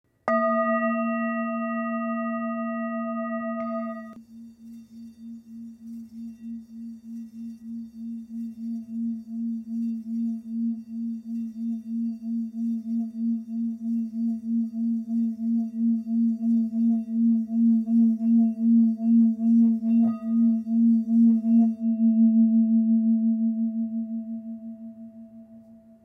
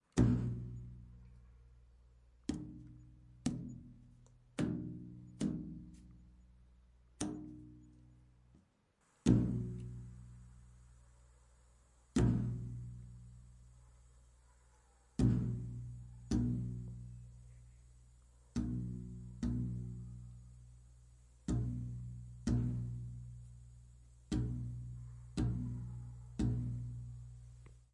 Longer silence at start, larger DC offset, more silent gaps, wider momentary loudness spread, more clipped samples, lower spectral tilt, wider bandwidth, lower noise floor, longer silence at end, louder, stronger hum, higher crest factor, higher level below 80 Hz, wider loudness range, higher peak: about the same, 0.25 s vs 0.15 s; neither; neither; second, 19 LU vs 26 LU; neither; first, -10 dB/octave vs -7.5 dB/octave; second, 2.9 kHz vs 11 kHz; second, -50 dBFS vs -75 dBFS; first, 0.3 s vs 0.15 s; first, -25 LUFS vs -40 LUFS; neither; second, 16 dB vs 24 dB; second, -74 dBFS vs -50 dBFS; first, 16 LU vs 7 LU; first, -10 dBFS vs -16 dBFS